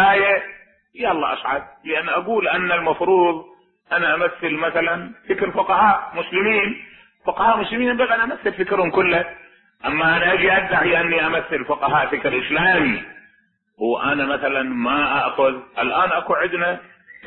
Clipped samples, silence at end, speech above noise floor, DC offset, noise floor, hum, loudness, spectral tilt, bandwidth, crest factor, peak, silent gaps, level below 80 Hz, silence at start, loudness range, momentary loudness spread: under 0.1%; 0 s; 42 dB; under 0.1%; -61 dBFS; none; -19 LUFS; -9.5 dB/octave; 4.3 kHz; 16 dB; -4 dBFS; none; -52 dBFS; 0 s; 2 LU; 9 LU